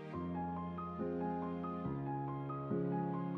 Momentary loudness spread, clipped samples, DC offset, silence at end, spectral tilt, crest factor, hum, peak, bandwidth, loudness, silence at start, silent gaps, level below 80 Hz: 4 LU; under 0.1%; under 0.1%; 0 s; -11 dB/octave; 14 dB; none; -26 dBFS; 4.5 kHz; -41 LUFS; 0 s; none; -66 dBFS